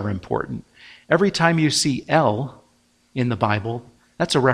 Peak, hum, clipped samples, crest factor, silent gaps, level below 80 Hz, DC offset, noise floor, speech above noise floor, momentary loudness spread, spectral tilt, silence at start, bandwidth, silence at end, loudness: 0 dBFS; none; under 0.1%; 20 dB; none; -54 dBFS; under 0.1%; -61 dBFS; 40 dB; 15 LU; -5 dB/octave; 0 s; 15.5 kHz; 0 s; -21 LUFS